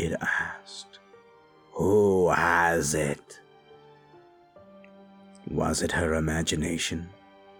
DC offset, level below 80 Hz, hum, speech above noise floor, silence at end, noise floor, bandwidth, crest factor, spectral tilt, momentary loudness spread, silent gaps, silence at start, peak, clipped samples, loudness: under 0.1%; -48 dBFS; none; 30 dB; 0.5 s; -56 dBFS; 19.5 kHz; 20 dB; -4.5 dB/octave; 20 LU; none; 0 s; -8 dBFS; under 0.1%; -26 LUFS